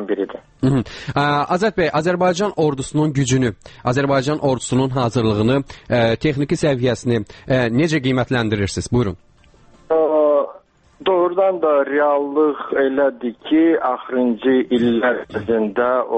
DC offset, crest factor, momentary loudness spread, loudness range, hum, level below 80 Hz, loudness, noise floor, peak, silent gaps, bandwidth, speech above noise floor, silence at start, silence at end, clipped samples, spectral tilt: under 0.1%; 12 dB; 6 LU; 2 LU; none; -46 dBFS; -18 LUFS; -49 dBFS; -6 dBFS; none; 8.8 kHz; 31 dB; 0 s; 0 s; under 0.1%; -6 dB/octave